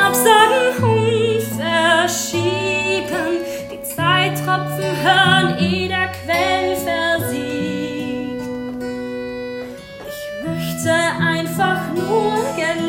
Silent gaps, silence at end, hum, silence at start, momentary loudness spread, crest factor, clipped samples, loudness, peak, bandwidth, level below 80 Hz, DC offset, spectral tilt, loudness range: none; 0 s; none; 0 s; 13 LU; 18 dB; under 0.1%; -18 LUFS; 0 dBFS; 16.5 kHz; -52 dBFS; under 0.1%; -4 dB/octave; 7 LU